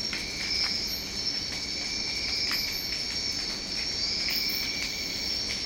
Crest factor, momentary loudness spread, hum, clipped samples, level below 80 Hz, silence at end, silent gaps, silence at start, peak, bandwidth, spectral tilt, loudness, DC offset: 14 dB; 4 LU; none; under 0.1%; -50 dBFS; 0 s; none; 0 s; -16 dBFS; 16.5 kHz; -1 dB/octave; -28 LUFS; under 0.1%